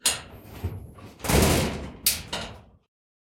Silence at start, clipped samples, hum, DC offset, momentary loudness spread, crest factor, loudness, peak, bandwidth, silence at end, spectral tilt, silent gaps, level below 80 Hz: 0.05 s; under 0.1%; none; under 0.1%; 20 LU; 22 dB; -26 LUFS; -6 dBFS; 16.5 kHz; 0.65 s; -3.5 dB/octave; none; -38 dBFS